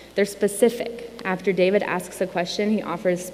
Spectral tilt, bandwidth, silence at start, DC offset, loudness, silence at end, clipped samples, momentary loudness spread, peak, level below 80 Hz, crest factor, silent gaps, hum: -5 dB/octave; 16 kHz; 0 s; under 0.1%; -23 LUFS; 0 s; under 0.1%; 8 LU; -4 dBFS; -58 dBFS; 18 dB; none; none